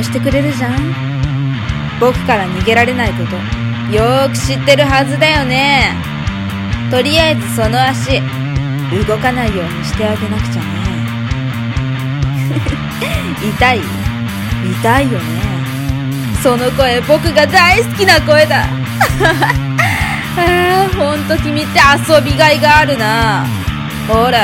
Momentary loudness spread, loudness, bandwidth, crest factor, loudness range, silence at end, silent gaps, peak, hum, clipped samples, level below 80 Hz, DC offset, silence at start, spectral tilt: 10 LU; -12 LUFS; 17 kHz; 12 dB; 6 LU; 0 s; none; 0 dBFS; none; 0.2%; -28 dBFS; under 0.1%; 0 s; -5 dB/octave